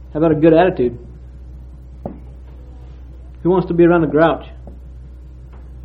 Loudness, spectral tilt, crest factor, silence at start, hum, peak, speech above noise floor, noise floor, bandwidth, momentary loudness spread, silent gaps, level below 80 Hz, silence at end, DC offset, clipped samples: -14 LUFS; -10.5 dB/octave; 18 dB; 0 s; none; 0 dBFS; 22 dB; -36 dBFS; 4.5 kHz; 26 LU; none; -36 dBFS; 0 s; under 0.1%; under 0.1%